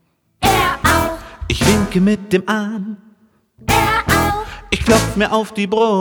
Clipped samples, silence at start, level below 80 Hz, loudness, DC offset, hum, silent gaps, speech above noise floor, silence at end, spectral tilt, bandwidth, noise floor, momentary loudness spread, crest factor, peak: under 0.1%; 0.4 s; -32 dBFS; -16 LUFS; under 0.1%; none; none; 38 dB; 0 s; -4.5 dB/octave; over 20 kHz; -54 dBFS; 10 LU; 16 dB; 0 dBFS